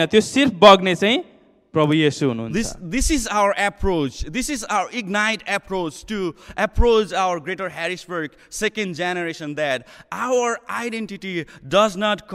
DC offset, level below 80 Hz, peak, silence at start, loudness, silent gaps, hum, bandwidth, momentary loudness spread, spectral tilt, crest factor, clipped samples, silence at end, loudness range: under 0.1%; -34 dBFS; 0 dBFS; 0 s; -20 LUFS; none; none; 15.5 kHz; 11 LU; -4 dB/octave; 20 dB; under 0.1%; 0 s; 7 LU